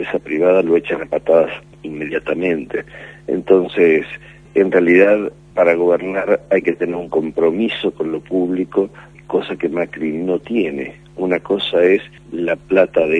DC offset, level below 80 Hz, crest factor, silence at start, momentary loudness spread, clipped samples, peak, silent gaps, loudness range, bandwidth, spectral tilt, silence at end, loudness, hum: under 0.1%; -52 dBFS; 16 dB; 0 s; 11 LU; under 0.1%; 0 dBFS; none; 5 LU; 9.6 kHz; -7 dB/octave; 0 s; -17 LUFS; none